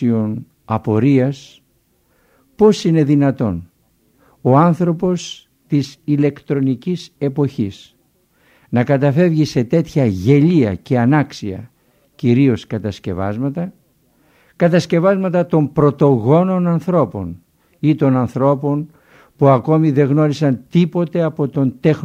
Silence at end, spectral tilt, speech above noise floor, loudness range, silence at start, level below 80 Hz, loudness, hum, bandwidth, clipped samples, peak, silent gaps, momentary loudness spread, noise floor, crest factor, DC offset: 0 s; -8 dB/octave; 45 dB; 4 LU; 0 s; -52 dBFS; -16 LUFS; none; 9 kHz; under 0.1%; 0 dBFS; none; 11 LU; -60 dBFS; 16 dB; under 0.1%